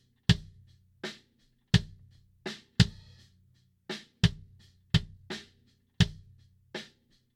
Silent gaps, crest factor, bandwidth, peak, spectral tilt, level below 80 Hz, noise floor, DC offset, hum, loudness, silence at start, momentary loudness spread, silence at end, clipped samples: none; 28 dB; 13 kHz; -6 dBFS; -5.5 dB/octave; -46 dBFS; -69 dBFS; under 0.1%; none; -31 LUFS; 0.3 s; 18 LU; 0.55 s; under 0.1%